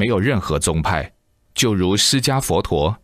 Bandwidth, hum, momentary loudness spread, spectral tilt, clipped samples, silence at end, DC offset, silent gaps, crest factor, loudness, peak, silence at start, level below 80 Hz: 15.5 kHz; none; 8 LU; -4 dB/octave; under 0.1%; 0.1 s; under 0.1%; none; 14 dB; -18 LUFS; -4 dBFS; 0 s; -36 dBFS